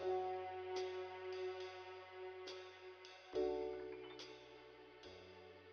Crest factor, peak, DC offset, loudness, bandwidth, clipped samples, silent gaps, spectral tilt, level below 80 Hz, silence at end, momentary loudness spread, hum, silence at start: 18 dB; -30 dBFS; under 0.1%; -48 LUFS; 6.8 kHz; under 0.1%; none; -3 dB/octave; -76 dBFS; 0 s; 16 LU; none; 0 s